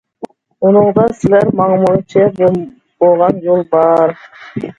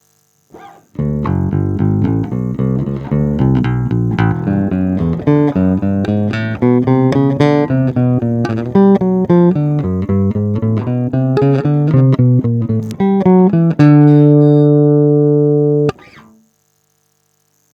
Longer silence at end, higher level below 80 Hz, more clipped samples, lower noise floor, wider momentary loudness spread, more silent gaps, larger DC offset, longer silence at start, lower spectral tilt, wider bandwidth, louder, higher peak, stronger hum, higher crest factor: second, 0.05 s vs 1.85 s; second, -48 dBFS vs -38 dBFS; second, under 0.1% vs 0.1%; second, -32 dBFS vs -60 dBFS; first, 20 LU vs 8 LU; neither; neither; second, 0.2 s vs 0.55 s; about the same, -9 dB/octave vs -10 dB/octave; first, 8.4 kHz vs 6.6 kHz; about the same, -12 LUFS vs -13 LUFS; about the same, 0 dBFS vs 0 dBFS; second, none vs 50 Hz at -40 dBFS; about the same, 12 dB vs 12 dB